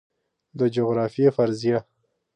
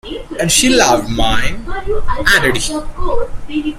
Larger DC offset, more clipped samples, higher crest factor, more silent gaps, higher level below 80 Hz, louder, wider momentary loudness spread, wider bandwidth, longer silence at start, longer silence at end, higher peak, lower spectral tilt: neither; neither; about the same, 18 dB vs 14 dB; neither; second, -66 dBFS vs -24 dBFS; second, -23 LUFS vs -14 LUFS; second, 7 LU vs 12 LU; second, 9.6 kHz vs 15.5 kHz; first, 0.55 s vs 0.05 s; first, 0.55 s vs 0 s; second, -6 dBFS vs 0 dBFS; first, -8 dB/octave vs -3 dB/octave